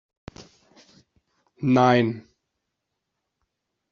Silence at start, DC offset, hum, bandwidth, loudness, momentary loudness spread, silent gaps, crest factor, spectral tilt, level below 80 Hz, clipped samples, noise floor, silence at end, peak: 0.4 s; under 0.1%; none; 7 kHz; -21 LUFS; 27 LU; none; 24 dB; -5.5 dB/octave; -64 dBFS; under 0.1%; -81 dBFS; 1.7 s; -4 dBFS